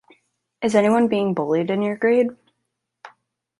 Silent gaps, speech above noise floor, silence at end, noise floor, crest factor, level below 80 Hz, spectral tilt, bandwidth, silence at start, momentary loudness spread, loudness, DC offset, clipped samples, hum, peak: none; 59 dB; 0.5 s; -77 dBFS; 18 dB; -66 dBFS; -6.5 dB/octave; 11.5 kHz; 0.6 s; 6 LU; -20 LUFS; under 0.1%; under 0.1%; none; -4 dBFS